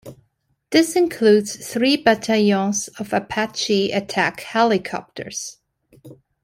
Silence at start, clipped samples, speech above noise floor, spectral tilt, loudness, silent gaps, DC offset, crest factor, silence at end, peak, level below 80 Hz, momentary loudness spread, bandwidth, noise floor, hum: 0.05 s; under 0.1%; 48 dB; -4 dB/octave; -19 LUFS; none; under 0.1%; 18 dB; 0.3 s; -2 dBFS; -60 dBFS; 13 LU; 16 kHz; -67 dBFS; none